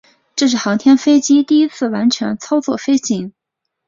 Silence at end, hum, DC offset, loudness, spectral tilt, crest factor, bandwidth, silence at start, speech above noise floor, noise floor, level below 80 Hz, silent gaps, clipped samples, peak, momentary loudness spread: 0.55 s; none; under 0.1%; -15 LUFS; -4 dB/octave; 12 dB; 7.6 kHz; 0.35 s; 63 dB; -77 dBFS; -60 dBFS; none; under 0.1%; -2 dBFS; 9 LU